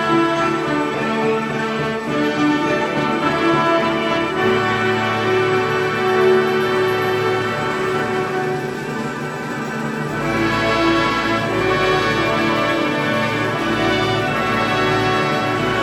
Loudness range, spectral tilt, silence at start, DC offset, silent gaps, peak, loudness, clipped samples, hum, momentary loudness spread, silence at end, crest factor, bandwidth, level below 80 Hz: 3 LU; -5.5 dB/octave; 0 s; under 0.1%; none; -4 dBFS; -18 LUFS; under 0.1%; none; 6 LU; 0 s; 14 dB; 16 kHz; -44 dBFS